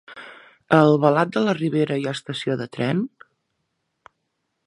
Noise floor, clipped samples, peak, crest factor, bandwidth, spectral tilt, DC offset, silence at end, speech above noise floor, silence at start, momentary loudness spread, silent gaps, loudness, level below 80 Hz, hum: -75 dBFS; under 0.1%; 0 dBFS; 22 dB; 11.5 kHz; -7 dB/octave; under 0.1%; 1.6 s; 56 dB; 0.1 s; 12 LU; none; -21 LUFS; -68 dBFS; none